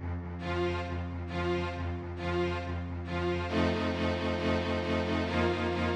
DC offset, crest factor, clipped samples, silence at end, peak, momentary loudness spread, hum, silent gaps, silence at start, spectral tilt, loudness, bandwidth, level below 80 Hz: under 0.1%; 18 dB; under 0.1%; 0 s; -14 dBFS; 7 LU; none; none; 0 s; -7 dB/octave; -32 LUFS; 8.8 kHz; -46 dBFS